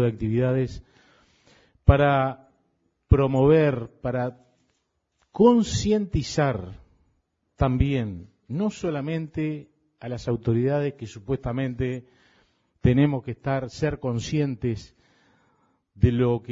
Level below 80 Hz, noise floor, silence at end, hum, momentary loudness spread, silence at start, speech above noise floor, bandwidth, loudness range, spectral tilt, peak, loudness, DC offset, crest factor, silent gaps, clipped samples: -40 dBFS; -74 dBFS; 0 s; none; 15 LU; 0 s; 51 dB; 7.8 kHz; 6 LU; -7.5 dB/octave; -4 dBFS; -24 LUFS; under 0.1%; 22 dB; none; under 0.1%